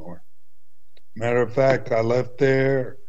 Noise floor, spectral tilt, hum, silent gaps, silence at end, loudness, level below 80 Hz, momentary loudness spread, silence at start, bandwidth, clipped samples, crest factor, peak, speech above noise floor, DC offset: -72 dBFS; -7.5 dB/octave; none; none; 0.15 s; -21 LUFS; -52 dBFS; 4 LU; 0 s; 8.2 kHz; under 0.1%; 16 dB; -6 dBFS; 52 dB; 3%